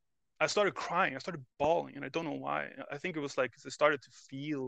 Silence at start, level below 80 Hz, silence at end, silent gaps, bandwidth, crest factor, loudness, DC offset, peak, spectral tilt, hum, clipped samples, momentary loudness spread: 0.4 s; -72 dBFS; 0 s; none; 9 kHz; 24 dB; -34 LUFS; under 0.1%; -10 dBFS; -4 dB/octave; none; under 0.1%; 11 LU